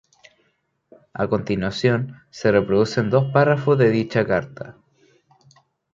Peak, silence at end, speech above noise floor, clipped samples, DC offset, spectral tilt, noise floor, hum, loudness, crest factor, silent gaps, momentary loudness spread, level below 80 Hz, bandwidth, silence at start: -4 dBFS; 1.2 s; 49 dB; under 0.1%; under 0.1%; -7 dB/octave; -68 dBFS; none; -20 LUFS; 18 dB; none; 17 LU; -52 dBFS; 7.6 kHz; 1.15 s